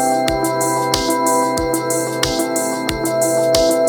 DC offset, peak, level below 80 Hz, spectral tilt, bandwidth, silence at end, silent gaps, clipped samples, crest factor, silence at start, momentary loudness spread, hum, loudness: under 0.1%; 0 dBFS; -38 dBFS; -3.5 dB/octave; over 20 kHz; 0 s; none; under 0.1%; 16 dB; 0 s; 4 LU; none; -17 LUFS